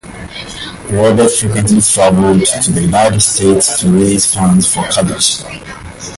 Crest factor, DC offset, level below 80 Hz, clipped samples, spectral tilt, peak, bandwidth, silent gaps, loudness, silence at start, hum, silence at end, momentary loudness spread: 12 dB; under 0.1%; -34 dBFS; under 0.1%; -4 dB/octave; 0 dBFS; 12 kHz; none; -10 LUFS; 0.05 s; none; 0 s; 16 LU